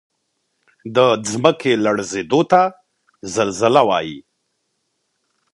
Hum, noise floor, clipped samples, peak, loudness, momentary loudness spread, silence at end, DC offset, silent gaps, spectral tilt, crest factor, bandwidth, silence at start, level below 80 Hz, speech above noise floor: none; -71 dBFS; under 0.1%; 0 dBFS; -17 LUFS; 14 LU; 1.35 s; under 0.1%; none; -4.5 dB/octave; 18 dB; 11.5 kHz; 0.85 s; -60 dBFS; 55 dB